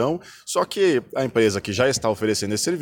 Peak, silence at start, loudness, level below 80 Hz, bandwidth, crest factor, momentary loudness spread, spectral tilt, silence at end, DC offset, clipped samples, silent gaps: -6 dBFS; 0 s; -22 LUFS; -56 dBFS; 19 kHz; 16 dB; 5 LU; -4 dB/octave; 0 s; under 0.1%; under 0.1%; none